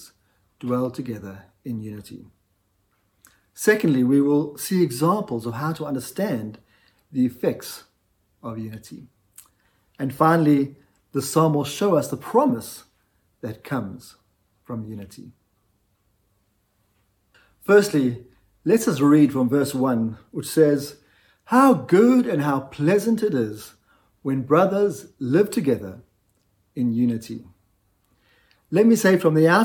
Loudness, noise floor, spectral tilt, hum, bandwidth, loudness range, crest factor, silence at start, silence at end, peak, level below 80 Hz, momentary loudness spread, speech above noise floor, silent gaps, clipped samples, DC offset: -21 LUFS; -68 dBFS; -6.5 dB/octave; none; 18 kHz; 13 LU; 20 dB; 0 s; 0 s; -4 dBFS; -64 dBFS; 20 LU; 47 dB; none; under 0.1%; under 0.1%